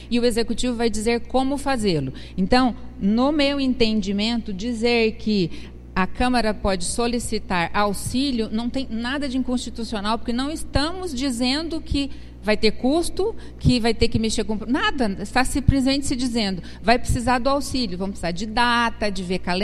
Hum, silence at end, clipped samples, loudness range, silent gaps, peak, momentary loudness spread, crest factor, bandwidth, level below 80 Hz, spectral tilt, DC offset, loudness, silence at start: 60 Hz at -40 dBFS; 0 s; under 0.1%; 3 LU; none; 0 dBFS; 7 LU; 20 dB; 13.5 kHz; -34 dBFS; -5 dB/octave; under 0.1%; -22 LUFS; 0 s